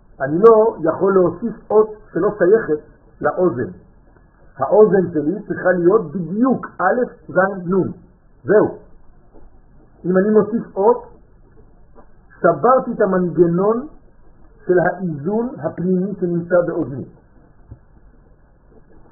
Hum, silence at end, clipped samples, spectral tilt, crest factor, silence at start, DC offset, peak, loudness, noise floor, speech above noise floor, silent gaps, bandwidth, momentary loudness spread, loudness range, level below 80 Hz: none; 1.35 s; under 0.1%; -4 dB/octave; 18 dB; 0.2 s; under 0.1%; 0 dBFS; -17 LUFS; -49 dBFS; 33 dB; none; 2.2 kHz; 11 LU; 4 LU; -48 dBFS